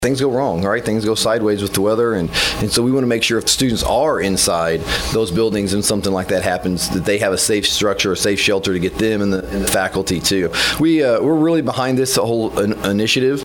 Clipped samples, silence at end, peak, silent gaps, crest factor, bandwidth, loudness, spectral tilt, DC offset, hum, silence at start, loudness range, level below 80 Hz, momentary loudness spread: under 0.1%; 0 s; -2 dBFS; none; 16 dB; 18 kHz; -16 LUFS; -4 dB/octave; under 0.1%; none; 0 s; 1 LU; -38 dBFS; 4 LU